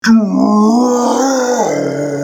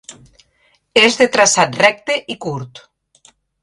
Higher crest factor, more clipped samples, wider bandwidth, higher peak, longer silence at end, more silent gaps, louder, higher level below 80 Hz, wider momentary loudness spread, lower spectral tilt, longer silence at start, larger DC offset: second, 10 dB vs 18 dB; neither; first, 16.5 kHz vs 11.5 kHz; about the same, -2 dBFS vs 0 dBFS; second, 0 s vs 0.85 s; neither; about the same, -12 LUFS vs -14 LUFS; about the same, -56 dBFS vs -58 dBFS; second, 5 LU vs 14 LU; first, -5 dB/octave vs -2 dB/octave; about the same, 0.05 s vs 0.1 s; neither